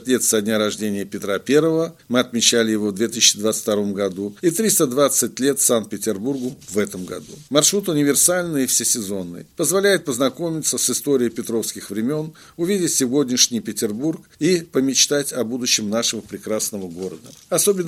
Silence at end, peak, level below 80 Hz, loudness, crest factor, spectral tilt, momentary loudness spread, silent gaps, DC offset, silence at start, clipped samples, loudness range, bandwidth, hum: 0 s; 0 dBFS; -62 dBFS; -19 LUFS; 20 dB; -3 dB/octave; 11 LU; none; under 0.1%; 0 s; under 0.1%; 3 LU; 16.5 kHz; none